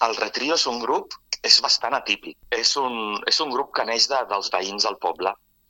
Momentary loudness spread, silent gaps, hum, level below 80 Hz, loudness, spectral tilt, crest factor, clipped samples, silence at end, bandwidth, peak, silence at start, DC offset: 11 LU; none; none; -62 dBFS; -21 LUFS; 0 dB/octave; 22 dB; under 0.1%; 0.35 s; 17 kHz; 0 dBFS; 0 s; under 0.1%